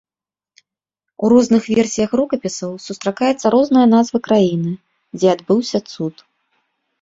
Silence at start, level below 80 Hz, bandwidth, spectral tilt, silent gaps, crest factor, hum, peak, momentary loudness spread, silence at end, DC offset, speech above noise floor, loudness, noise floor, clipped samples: 1.2 s; -56 dBFS; 7.8 kHz; -6 dB/octave; none; 16 dB; none; -2 dBFS; 14 LU; 0.9 s; under 0.1%; over 75 dB; -16 LUFS; under -90 dBFS; under 0.1%